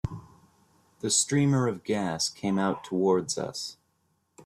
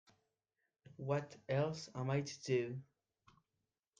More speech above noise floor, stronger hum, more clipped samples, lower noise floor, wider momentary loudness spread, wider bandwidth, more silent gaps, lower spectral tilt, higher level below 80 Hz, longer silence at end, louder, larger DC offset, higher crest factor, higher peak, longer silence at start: second, 46 dB vs 50 dB; neither; neither; second, -73 dBFS vs -90 dBFS; first, 13 LU vs 8 LU; first, 13 kHz vs 9.2 kHz; neither; second, -4.5 dB/octave vs -6 dB/octave; first, -56 dBFS vs -78 dBFS; second, 0.05 s vs 1.15 s; first, -27 LUFS vs -40 LUFS; neither; about the same, 18 dB vs 20 dB; first, -10 dBFS vs -24 dBFS; second, 0.05 s vs 1 s